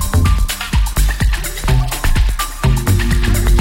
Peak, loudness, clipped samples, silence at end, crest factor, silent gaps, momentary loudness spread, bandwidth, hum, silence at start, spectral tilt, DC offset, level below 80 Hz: -2 dBFS; -16 LUFS; under 0.1%; 0 s; 10 dB; none; 3 LU; 17 kHz; none; 0 s; -4.5 dB/octave; under 0.1%; -16 dBFS